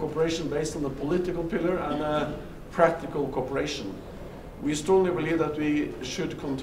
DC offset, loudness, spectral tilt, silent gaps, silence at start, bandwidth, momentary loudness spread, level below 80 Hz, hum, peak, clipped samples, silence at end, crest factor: under 0.1%; -28 LUFS; -5.5 dB/octave; none; 0 s; 15.5 kHz; 11 LU; -46 dBFS; none; -4 dBFS; under 0.1%; 0 s; 22 dB